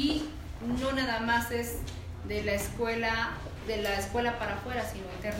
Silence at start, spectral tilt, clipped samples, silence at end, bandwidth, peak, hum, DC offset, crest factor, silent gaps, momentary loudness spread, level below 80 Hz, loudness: 0 s; -4.5 dB/octave; under 0.1%; 0 s; 16 kHz; -14 dBFS; none; under 0.1%; 18 dB; none; 10 LU; -44 dBFS; -32 LUFS